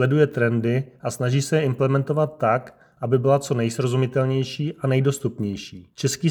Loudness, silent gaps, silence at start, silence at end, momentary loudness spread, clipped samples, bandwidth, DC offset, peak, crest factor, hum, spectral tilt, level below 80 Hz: -22 LUFS; none; 0 s; 0 s; 8 LU; under 0.1%; 18 kHz; under 0.1%; -6 dBFS; 16 dB; none; -6.5 dB/octave; -62 dBFS